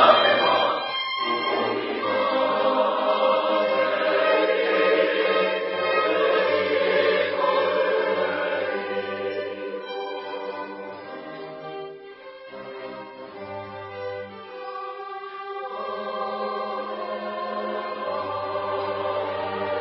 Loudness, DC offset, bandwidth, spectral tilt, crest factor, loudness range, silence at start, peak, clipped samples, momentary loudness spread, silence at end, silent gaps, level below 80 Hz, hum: -24 LUFS; under 0.1%; 5.8 kHz; -8 dB/octave; 22 dB; 15 LU; 0 s; -2 dBFS; under 0.1%; 16 LU; 0 s; none; -72 dBFS; none